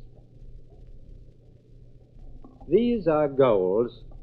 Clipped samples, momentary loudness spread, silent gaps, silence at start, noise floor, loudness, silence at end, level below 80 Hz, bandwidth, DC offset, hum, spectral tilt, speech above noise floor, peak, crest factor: under 0.1%; 5 LU; none; 0 s; -51 dBFS; -23 LUFS; 0 s; -46 dBFS; 4.9 kHz; under 0.1%; none; -10 dB/octave; 29 dB; -8 dBFS; 18 dB